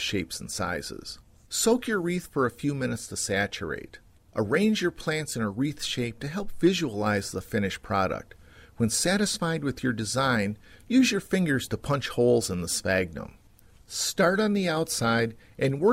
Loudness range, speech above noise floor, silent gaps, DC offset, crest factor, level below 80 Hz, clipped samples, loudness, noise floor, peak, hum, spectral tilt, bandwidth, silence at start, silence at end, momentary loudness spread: 3 LU; 28 dB; none; under 0.1%; 16 dB; -52 dBFS; under 0.1%; -27 LUFS; -55 dBFS; -10 dBFS; none; -4.5 dB/octave; 16 kHz; 0 s; 0 s; 11 LU